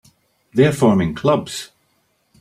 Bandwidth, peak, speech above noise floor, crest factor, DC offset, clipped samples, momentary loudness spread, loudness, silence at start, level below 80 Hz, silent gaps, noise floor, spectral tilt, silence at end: 15.5 kHz; -2 dBFS; 48 dB; 18 dB; under 0.1%; under 0.1%; 16 LU; -17 LUFS; 0.55 s; -50 dBFS; none; -64 dBFS; -6.5 dB/octave; 0.75 s